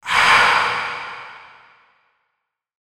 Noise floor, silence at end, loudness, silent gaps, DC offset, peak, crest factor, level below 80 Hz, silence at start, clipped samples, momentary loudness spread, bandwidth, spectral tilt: -77 dBFS; 1.4 s; -15 LUFS; none; under 0.1%; 0 dBFS; 20 dB; -56 dBFS; 0.05 s; under 0.1%; 23 LU; 16 kHz; -0.5 dB/octave